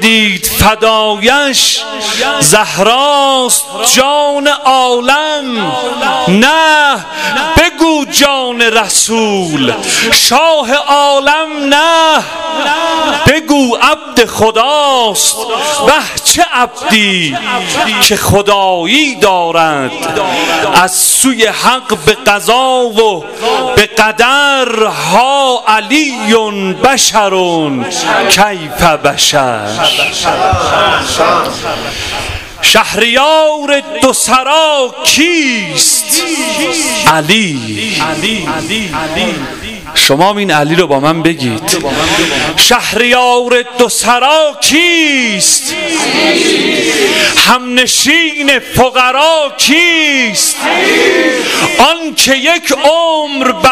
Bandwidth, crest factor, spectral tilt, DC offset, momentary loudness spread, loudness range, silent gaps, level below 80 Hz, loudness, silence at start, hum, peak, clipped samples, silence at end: over 20 kHz; 10 dB; -2 dB/octave; 0.5%; 6 LU; 2 LU; none; -36 dBFS; -8 LUFS; 0 s; none; 0 dBFS; 0.6%; 0 s